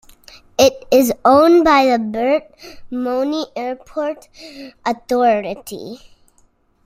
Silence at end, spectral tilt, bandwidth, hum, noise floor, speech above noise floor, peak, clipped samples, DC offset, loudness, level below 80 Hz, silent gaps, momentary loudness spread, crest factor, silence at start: 0.9 s; -4 dB/octave; 16 kHz; none; -56 dBFS; 40 dB; 0 dBFS; under 0.1%; under 0.1%; -16 LUFS; -50 dBFS; none; 20 LU; 18 dB; 0.6 s